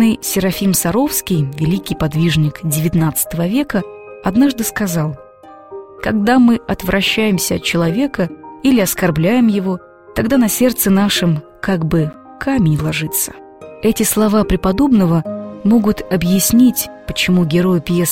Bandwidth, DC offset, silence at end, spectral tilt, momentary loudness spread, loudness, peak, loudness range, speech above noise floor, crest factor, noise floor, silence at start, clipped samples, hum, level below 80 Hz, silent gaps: 16.5 kHz; 0.4%; 0 s; -5 dB/octave; 9 LU; -15 LUFS; 0 dBFS; 3 LU; 25 dB; 14 dB; -39 dBFS; 0 s; under 0.1%; none; -36 dBFS; none